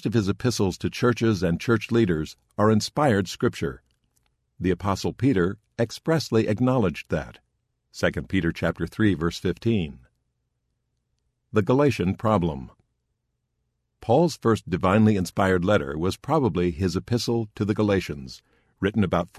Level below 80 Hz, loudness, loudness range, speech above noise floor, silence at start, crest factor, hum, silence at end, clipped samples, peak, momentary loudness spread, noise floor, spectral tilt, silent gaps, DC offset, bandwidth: -44 dBFS; -24 LUFS; 4 LU; 53 dB; 0.05 s; 18 dB; none; 0 s; under 0.1%; -6 dBFS; 8 LU; -77 dBFS; -6.5 dB/octave; none; under 0.1%; 14 kHz